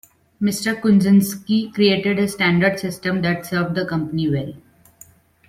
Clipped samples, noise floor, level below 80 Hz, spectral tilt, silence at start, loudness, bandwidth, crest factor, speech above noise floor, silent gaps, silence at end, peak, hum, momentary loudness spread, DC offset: under 0.1%; -49 dBFS; -54 dBFS; -5.5 dB/octave; 0.4 s; -19 LUFS; 16 kHz; 16 dB; 31 dB; none; 0.9 s; -4 dBFS; none; 7 LU; under 0.1%